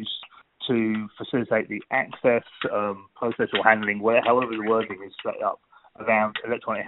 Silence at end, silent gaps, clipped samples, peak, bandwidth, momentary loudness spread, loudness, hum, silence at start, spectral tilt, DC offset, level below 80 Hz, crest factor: 0 s; none; under 0.1%; -2 dBFS; 4.1 kHz; 13 LU; -24 LUFS; none; 0 s; -2.5 dB/octave; under 0.1%; -66 dBFS; 24 dB